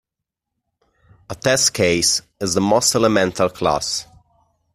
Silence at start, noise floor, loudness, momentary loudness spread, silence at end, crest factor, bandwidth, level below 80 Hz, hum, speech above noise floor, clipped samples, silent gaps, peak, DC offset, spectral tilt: 1.3 s; -83 dBFS; -17 LUFS; 8 LU; 0.7 s; 18 dB; 15.5 kHz; -52 dBFS; none; 65 dB; under 0.1%; none; -2 dBFS; under 0.1%; -3 dB/octave